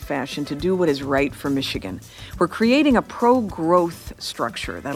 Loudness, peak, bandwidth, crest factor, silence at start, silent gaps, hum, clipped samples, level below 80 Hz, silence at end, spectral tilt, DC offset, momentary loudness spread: -21 LUFS; -4 dBFS; 16 kHz; 16 dB; 0 s; none; none; under 0.1%; -44 dBFS; 0 s; -5.5 dB/octave; under 0.1%; 13 LU